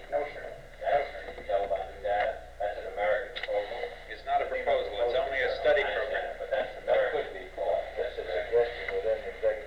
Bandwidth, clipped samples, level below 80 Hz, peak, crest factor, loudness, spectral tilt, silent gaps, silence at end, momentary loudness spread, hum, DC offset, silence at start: 11 kHz; under 0.1%; -50 dBFS; -16 dBFS; 16 dB; -31 LUFS; -4.5 dB/octave; none; 0 s; 9 LU; 60 Hz at -55 dBFS; 0.2%; 0 s